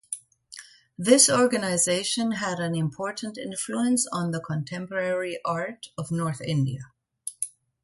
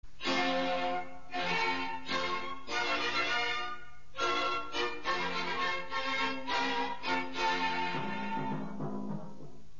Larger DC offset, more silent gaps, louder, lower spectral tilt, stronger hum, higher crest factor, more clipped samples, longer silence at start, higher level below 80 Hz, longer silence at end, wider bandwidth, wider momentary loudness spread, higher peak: second, under 0.1% vs 1%; neither; first, -25 LUFS vs -33 LUFS; first, -4 dB/octave vs -1 dB/octave; neither; first, 22 dB vs 16 dB; neither; about the same, 0.1 s vs 0 s; second, -66 dBFS vs -60 dBFS; first, 0.35 s vs 0.1 s; first, 12 kHz vs 7.2 kHz; first, 17 LU vs 9 LU; first, -4 dBFS vs -20 dBFS